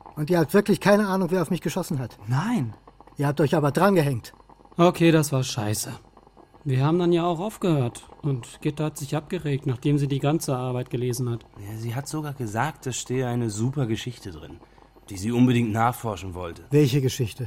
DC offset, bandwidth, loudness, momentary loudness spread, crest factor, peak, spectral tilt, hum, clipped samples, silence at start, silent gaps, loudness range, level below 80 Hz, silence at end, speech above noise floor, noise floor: under 0.1%; 16.5 kHz; -24 LUFS; 14 LU; 20 dB; -4 dBFS; -6 dB/octave; none; under 0.1%; 0.05 s; none; 6 LU; -54 dBFS; 0 s; 28 dB; -52 dBFS